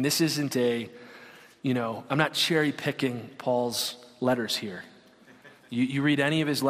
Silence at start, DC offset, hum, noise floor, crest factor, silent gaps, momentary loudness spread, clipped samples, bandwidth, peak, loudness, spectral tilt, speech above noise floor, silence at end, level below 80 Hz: 0 s; under 0.1%; none; -55 dBFS; 20 dB; none; 13 LU; under 0.1%; 15.5 kHz; -8 dBFS; -27 LUFS; -4.5 dB/octave; 28 dB; 0 s; -70 dBFS